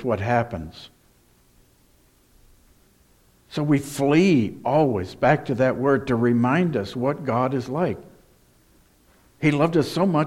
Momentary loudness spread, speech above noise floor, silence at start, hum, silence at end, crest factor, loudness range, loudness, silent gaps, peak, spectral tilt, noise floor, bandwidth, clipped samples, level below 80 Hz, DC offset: 9 LU; 37 dB; 0 s; none; 0 s; 18 dB; 11 LU; -22 LUFS; none; -6 dBFS; -7 dB/octave; -58 dBFS; 16 kHz; under 0.1%; -54 dBFS; under 0.1%